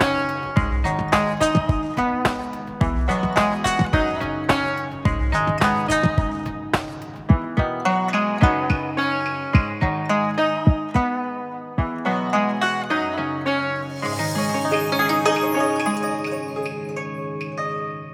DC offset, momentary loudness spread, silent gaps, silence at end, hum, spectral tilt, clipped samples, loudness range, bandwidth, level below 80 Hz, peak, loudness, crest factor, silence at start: under 0.1%; 9 LU; none; 0 s; none; -6 dB/octave; under 0.1%; 2 LU; 18 kHz; -32 dBFS; -2 dBFS; -22 LUFS; 20 dB; 0 s